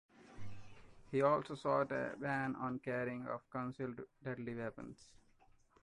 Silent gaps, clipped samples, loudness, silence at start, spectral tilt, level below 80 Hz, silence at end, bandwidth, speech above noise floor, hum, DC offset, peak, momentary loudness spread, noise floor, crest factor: none; under 0.1%; -40 LUFS; 0.15 s; -7.5 dB/octave; -70 dBFS; 0.7 s; 11 kHz; 29 dB; none; under 0.1%; -20 dBFS; 21 LU; -69 dBFS; 22 dB